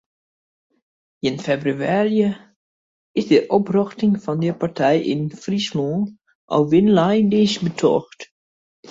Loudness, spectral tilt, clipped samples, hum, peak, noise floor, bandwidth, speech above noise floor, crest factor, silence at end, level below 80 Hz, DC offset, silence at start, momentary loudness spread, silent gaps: -19 LUFS; -6.5 dB/octave; under 0.1%; none; -4 dBFS; under -90 dBFS; 7.8 kHz; over 72 dB; 16 dB; 0 s; -60 dBFS; under 0.1%; 1.25 s; 10 LU; 2.56-3.15 s, 6.35-6.48 s, 8.31-8.83 s